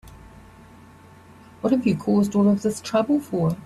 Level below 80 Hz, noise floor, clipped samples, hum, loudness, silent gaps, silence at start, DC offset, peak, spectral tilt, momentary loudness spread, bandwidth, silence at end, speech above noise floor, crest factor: -54 dBFS; -48 dBFS; under 0.1%; none; -22 LUFS; none; 0.05 s; under 0.1%; -8 dBFS; -7 dB/octave; 5 LU; 13 kHz; 0 s; 27 dB; 16 dB